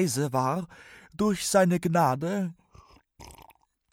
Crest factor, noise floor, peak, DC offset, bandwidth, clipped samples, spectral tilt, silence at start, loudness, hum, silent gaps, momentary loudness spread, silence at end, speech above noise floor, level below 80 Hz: 18 dB; -59 dBFS; -10 dBFS; under 0.1%; 17 kHz; under 0.1%; -5.5 dB/octave; 0 s; -26 LUFS; none; none; 12 LU; 0.5 s; 33 dB; -60 dBFS